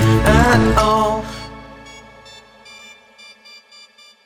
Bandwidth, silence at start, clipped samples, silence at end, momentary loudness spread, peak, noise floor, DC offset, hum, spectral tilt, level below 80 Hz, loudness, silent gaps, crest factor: 18 kHz; 0 s; under 0.1%; 2.25 s; 27 LU; 0 dBFS; -46 dBFS; under 0.1%; none; -6 dB/octave; -28 dBFS; -14 LUFS; none; 18 dB